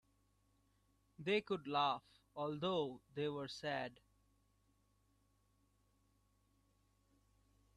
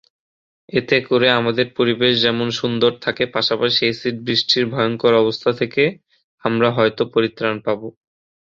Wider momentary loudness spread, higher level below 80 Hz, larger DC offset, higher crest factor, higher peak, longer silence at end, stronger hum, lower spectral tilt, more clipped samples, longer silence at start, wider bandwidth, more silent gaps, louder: about the same, 9 LU vs 8 LU; second, -78 dBFS vs -58 dBFS; neither; about the same, 22 dB vs 18 dB; second, -24 dBFS vs 0 dBFS; first, 3.85 s vs 0.55 s; first, 50 Hz at -75 dBFS vs none; about the same, -5.5 dB/octave vs -5.5 dB/octave; neither; first, 1.2 s vs 0.75 s; first, 12 kHz vs 7.6 kHz; second, none vs 6.24-6.38 s; second, -42 LUFS vs -18 LUFS